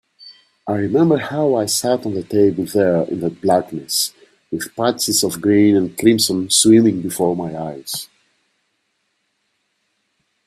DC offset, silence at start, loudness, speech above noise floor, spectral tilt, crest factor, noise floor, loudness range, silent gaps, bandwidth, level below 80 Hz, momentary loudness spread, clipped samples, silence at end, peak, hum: under 0.1%; 0.25 s; -17 LUFS; 53 dB; -4 dB/octave; 18 dB; -69 dBFS; 5 LU; none; 16 kHz; -58 dBFS; 13 LU; under 0.1%; 2.4 s; 0 dBFS; none